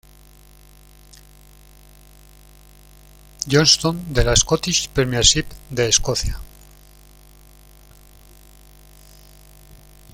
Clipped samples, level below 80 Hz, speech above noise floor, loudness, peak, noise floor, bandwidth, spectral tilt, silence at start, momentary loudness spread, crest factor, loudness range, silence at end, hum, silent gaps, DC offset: under 0.1%; -34 dBFS; 29 dB; -17 LUFS; 0 dBFS; -47 dBFS; 17 kHz; -2.5 dB/octave; 3.4 s; 14 LU; 22 dB; 8 LU; 0.4 s; 50 Hz at -40 dBFS; none; under 0.1%